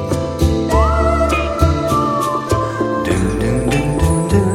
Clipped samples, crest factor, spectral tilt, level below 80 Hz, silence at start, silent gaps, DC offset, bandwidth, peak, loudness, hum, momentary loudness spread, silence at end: under 0.1%; 14 dB; -6.5 dB/octave; -22 dBFS; 0 s; none; under 0.1%; 16 kHz; -2 dBFS; -16 LUFS; none; 4 LU; 0 s